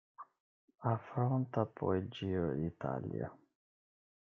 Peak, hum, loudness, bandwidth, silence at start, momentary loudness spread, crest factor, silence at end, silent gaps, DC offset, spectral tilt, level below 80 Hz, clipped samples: -18 dBFS; none; -38 LUFS; 6.2 kHz; 0.2 s; 12 LU; 20 dB; 0.95 s; 0.40-0.68 s; under 0.1%; -9.5 dB/octave; -68 dBFS; under 0.1%